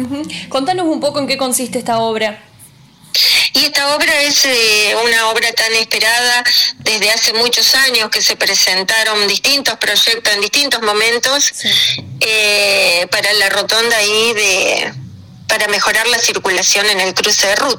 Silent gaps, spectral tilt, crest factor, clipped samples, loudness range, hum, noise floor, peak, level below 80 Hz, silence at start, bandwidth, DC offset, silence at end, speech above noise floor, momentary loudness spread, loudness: none; -0.5 dB/octave; 10 dB; under 0.1%; 2 LU; none; -42 dBFS; -4 dBFS; -52 dBFS; 0 s; 19.5 kHz; under 0.1%; 0 s; 29 dB; 7 LU; -11 LUFS